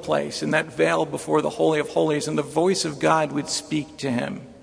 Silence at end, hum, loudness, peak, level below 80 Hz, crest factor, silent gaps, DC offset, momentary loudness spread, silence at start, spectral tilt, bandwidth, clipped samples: 0 s; none; -23 LUFS; -4 dBFS; -60 dBFS; 20 dB; none; under 0.1%; 6 LU; 0 s; -4.5 dB/octave; 11 kHz; under 0.1%